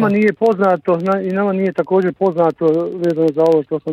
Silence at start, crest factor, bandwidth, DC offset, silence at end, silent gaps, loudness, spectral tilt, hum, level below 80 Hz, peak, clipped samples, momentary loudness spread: 0 s; 12 dB; 8.6 kHz; under 0.1%; 0 s; none; -16 LUFS; -8.5 dB/octave; none; -62 dBFS; -4 dBFS; under 0.1%; 4 LU